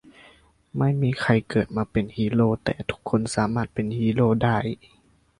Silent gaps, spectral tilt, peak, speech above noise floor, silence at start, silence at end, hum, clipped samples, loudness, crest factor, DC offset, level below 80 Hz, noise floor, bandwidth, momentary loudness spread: none; -7 dB/octave; -6 dBFS; 32 dB; 0.75 s; 0.65 s; none; under 0.1%; -24 LUFS; 18 dB; under 0.1%; -50 dBFS; -55 dBFS; 11 kHz; 7 LU